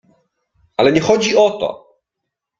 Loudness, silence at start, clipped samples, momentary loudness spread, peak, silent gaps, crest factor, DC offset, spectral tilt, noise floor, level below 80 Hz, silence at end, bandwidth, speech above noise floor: -15 LUFS; 0.8 s; under 0.1%; 12 LU; -2 dBFS; none; 16 dB; under 0.1%; -4.5 dB/octave; -80 dBFS; -54 dBFS; 0.85 s; 7.6 kHz; 66 dB